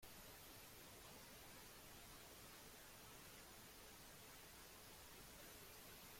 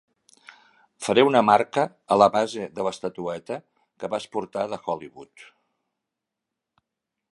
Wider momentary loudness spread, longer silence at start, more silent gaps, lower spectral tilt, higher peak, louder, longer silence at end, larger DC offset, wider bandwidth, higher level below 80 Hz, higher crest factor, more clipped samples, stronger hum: second, 1 LU vs 15 LU; second, 0 s vs 1 s; neither; second, -2 dB/octave vs -5 dB/octave; second, -46 dBFS vs -2 dBFS; second, -60 LUFS vs -23 LUFS; second, 0 s vs 1.9 s; neither; first, 16.5 kHz vs 11.5 kHz; about the same, -72 dBFS vs -68 dBFS; second, 14 dB vs 24 dB; neither; neither